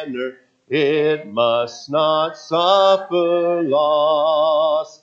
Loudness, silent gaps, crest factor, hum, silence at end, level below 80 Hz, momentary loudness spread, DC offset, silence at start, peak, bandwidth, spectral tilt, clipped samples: -18 LUFS; none; 16 dB; none; 0.15 s; -74 dBFS; 7 LU; under 0.1%; 0 s; -2 dBFS; 7.6 kHz; -5 dB/octave; under 0.1%